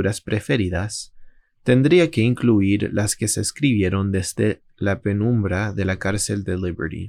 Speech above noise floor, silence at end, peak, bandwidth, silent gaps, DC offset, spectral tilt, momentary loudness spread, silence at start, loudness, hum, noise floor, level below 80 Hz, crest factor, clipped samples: 24 dB; 0 s; -4 dBFS; 14.5 kHz; none; under 0.1%; -5.5 dB/octave; 9 LU; 0 s; -21 LUFS; none; -44 dBFS; -48 dBFS; 16 dB; under 0.1%